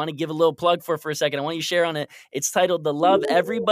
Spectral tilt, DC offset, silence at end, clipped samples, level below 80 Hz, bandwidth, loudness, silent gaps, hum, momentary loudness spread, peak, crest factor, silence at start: -3.5 dB/octave; under 0.1%; 0 s; under 0.1%; -70 dBFS; 15.5 kHz; -22 LUFS; none; none; 7 LU; -6 dBFS; 16 dB; 0 s